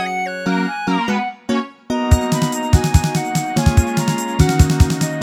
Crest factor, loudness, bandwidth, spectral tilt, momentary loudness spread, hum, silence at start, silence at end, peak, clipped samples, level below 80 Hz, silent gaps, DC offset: 16 dB; -17 LUFS; 17 kHz; -5.5 dB/octave; 7 LU; none; 0 s; 0 s; 0 dBFS; under 0.1%; -24 dBFS; none; under 0.1%